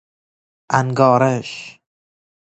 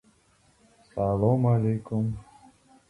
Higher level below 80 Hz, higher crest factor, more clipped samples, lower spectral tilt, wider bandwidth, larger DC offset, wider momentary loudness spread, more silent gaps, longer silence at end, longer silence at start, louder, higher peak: second, -60 dBFS vs -52 dBFS; about the same, 20 dB vs 18 dB; neither; second, -6.5 dB/octave vs -11 dB/octave; second, 8.4 kHz vs 10.5 kHz; neither; first, 19 LU vs 13 LU; neither; first, 0.85 s vs 0.65 s; second, 0.7 s vs 0.95 s; first, -16 LUFS vs -26 LUFS; first, 0 dBFS vs -10 dBFS